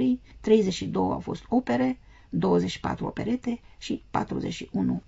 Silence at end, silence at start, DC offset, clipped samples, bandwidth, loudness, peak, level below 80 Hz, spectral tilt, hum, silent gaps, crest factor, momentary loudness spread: 0.1 s; 0 s; under 0.1%; under 0.1%; 8 kHz; -27 LUFS; -8 dBFS; -50 dBFS; -6.5 dB/octave; none; none; 18 dB; 11 LU